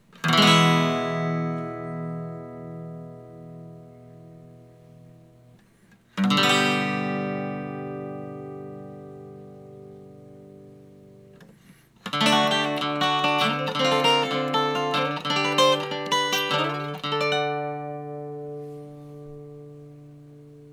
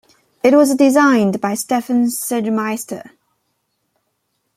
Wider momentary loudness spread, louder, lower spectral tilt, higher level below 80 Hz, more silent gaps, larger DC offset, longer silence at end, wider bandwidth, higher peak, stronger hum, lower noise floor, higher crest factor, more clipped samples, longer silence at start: first, 23 LU vs 12 LU; second, -23 LUFS vs -15 LUFS; about the same, -4.5 dB/octave vs -5 dB/octave; about the same, -68 dBFS vs -64 dBFS; neither; neither; second, 0 s vs 1.55 s; first, 19.5 kHz vs 16 kHz; second, -6 dBFS vs -2 dBFS; neither; second, -57 dBFS vs -70 dBFS; first, 22 dB vs 16 dB; neither; second, 0.15 s vs 0.45 s